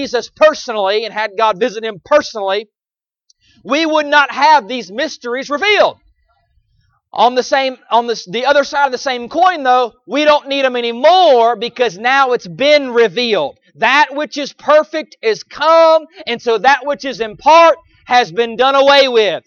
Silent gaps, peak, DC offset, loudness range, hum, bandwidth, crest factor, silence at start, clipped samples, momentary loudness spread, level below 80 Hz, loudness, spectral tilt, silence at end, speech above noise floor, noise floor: none; 0 dBFS; under 0.1%; 4 LU; none; 7.2 kHz; 14 dB; 0 s; under 0.1%; 11 LU; -58 dBFS; -13 LUFS; -3 dB/octave; 0.05 s; over 77 dB; under -90 dBFS